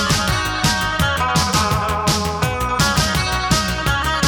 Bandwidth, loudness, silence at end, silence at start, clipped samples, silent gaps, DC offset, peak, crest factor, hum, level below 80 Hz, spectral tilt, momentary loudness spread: 19 kHz; -17 LUFS; 0 s; 0 s; under 0.1%; none; under 0.1%; -2 dBFS; 16 dB; none; -28 dBFS; -3.5 dB/octave; 3 LU